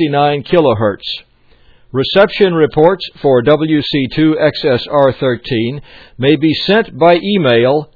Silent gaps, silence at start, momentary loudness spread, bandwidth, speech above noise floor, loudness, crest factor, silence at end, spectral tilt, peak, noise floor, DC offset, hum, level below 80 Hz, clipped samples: none; 0 s; 7 LU; 5.4 kHz; 34 dB; -12 LUFS; 12 dB; 0.1 s; -8.5 dB/octave; 0 dBFS; -46 dBFS; under 0.1%; none; -44 dBFS; 0.2%